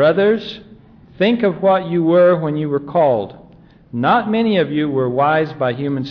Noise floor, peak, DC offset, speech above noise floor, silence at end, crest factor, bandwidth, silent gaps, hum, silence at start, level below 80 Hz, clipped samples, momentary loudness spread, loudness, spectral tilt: -45 dBFS; -4 dBFS; under 0.1%; 29 dB; 0 s; 12 dB; 5.4 kHz; none; none; 0 s; -54 dBFS; under 0.1%; 9 LU; -16 LUFS; -9 dB/octave